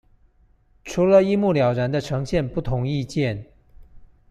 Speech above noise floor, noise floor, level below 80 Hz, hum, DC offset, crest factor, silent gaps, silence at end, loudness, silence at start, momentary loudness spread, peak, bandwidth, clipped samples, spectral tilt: 38 dB; -58 dBFS; -44 dBFS; none; under 0.1%; 18 dB; none; 0.25 s; -21 LUFS; 0.85 s; 11 LU; -4 dBFS; 11.5 kHz; under 0.1%; -7 dB/octave